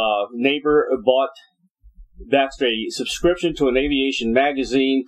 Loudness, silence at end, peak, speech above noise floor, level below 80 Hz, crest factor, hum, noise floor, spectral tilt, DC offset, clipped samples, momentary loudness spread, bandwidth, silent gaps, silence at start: -19 LUFS; 0.05 s; -2 dBFS; 28 dB; -44 dBFS; 18 dB; none; -47 dBFS; -4 dB/octave; under 0.1%; under 0.1%; 3 LU; 13 kHz; 1.70-1.75 s; 0 s